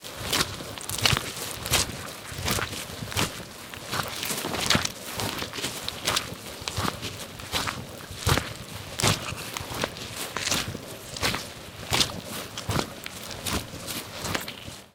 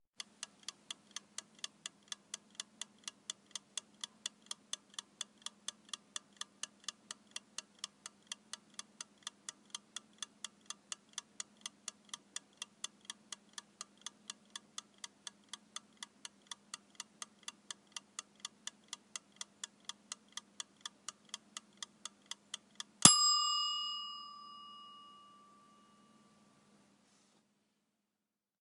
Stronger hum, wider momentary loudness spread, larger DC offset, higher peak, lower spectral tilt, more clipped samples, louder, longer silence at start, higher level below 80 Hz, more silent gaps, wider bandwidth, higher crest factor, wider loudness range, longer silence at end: neither; first, 12 LU vs 8 LU; neither; about the same, -2 dBFS vs -2 dBFS; first, -2.5 dB/octave vs -0.5 dB/octave; neither; first, -28 LUFS vs -39 LUFS; second, 0 s vs 0.4 s; first, -48 dBFS vs -82 dBFS; neither; first, 19 kHz vs 17 kHz; second, 28 dB vs 42 dB; second, 2 LU vs 19 LU; second, 0.05 s vs 3.4 s